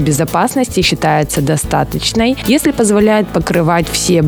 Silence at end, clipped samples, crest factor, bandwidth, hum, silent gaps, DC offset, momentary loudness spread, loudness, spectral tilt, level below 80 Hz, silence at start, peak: 0 s; under 0.1%; 12 dB; over 20 kHz; none; none; under 0.1%; 3 LU; -13 LUFS; -4.5 dB/octave; -32 dBFS; 0 s; 0 dBFS